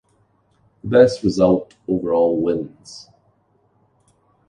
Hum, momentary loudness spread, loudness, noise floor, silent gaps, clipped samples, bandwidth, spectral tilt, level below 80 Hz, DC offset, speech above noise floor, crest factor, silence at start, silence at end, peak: none; 23 LU; -18 LUFS; -61 dBFS; none; under 0.1%; 10 kHz; -7 dB/octave; -50 dBFS; under 0.1%; 44 dB; 20 dB; 0.85 s; 1.45 s; 0 dBFS